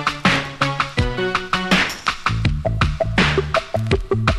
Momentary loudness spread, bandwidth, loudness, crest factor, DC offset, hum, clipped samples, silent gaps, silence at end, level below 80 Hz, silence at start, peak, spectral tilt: 4 LU; 13.5 kHz; -19 LUFS; 18 dB; under 0.1%; none; under 0.1%; none; 0 s; -30 dBFS; 0 s; -2 dBFS; -5 dB/octave